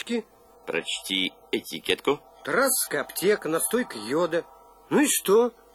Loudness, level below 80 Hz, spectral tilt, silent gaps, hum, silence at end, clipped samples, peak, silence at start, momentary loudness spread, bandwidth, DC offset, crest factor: -25 LUFS; -64 dBFS; -2.5 dB/octave; none; none; 0.25 s; under 0.1%; -8 dBFS; 0 s; 9 LU; 15 kHz; under 0.1%; 18 dB